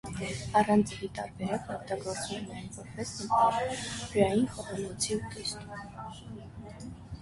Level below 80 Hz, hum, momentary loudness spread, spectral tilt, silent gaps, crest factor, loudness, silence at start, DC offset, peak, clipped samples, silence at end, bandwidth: -54 dBFS; none; 18 LU; -4.5 dB/octave; none; 22 dB; -31 LUFS; 0.05 s; under 0.1%; -10 dBFS; under 0.1%; 0 s; 11.5 kHz